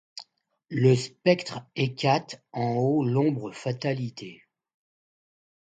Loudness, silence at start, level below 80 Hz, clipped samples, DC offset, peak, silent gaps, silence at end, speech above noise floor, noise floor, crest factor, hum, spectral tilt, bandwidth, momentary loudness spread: -26 LUFS; 0.15 s; -70 dBFS; under 0.1%; under 0.1%; -6 dBFS; none; 1.4 s; 29 dB; -55 dBFS; 22 dB; none; -6.5 dB/octave; 9 kHz; 15 LU